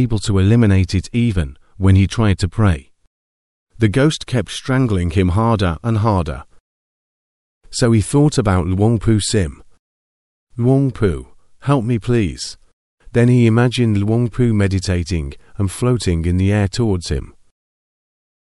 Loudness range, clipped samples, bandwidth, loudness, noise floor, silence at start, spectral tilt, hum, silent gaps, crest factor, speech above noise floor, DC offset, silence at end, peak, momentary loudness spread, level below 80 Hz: 3 LU; under 0.1%; 11.5 kHz; -17 LUFS; under -90 dBFS; 0 s; -6.5 dB/octave; none; 3.07-3.67 s, 6.60-7.61 s, 9.79-10.47 s, 12.73-12.98 s; 16 dB; over 75 dB; 0.3%; 1.2 s; -2 dBFS; 10 LU; -34 dBFS